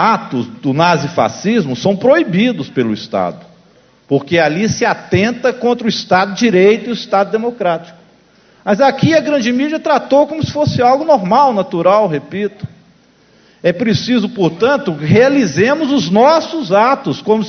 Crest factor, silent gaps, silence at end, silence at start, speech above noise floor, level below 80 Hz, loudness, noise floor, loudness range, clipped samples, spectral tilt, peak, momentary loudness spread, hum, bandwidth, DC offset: 14 dB; none; 0 s; 0 s; 36 dB; -48 dBFS; -13 LUFS; -49 dBFS; 3 LU; under 0.1%; -6 dB/octave; 0 dBFS; 8 LU; none; 6.6 kHz; under 0.1%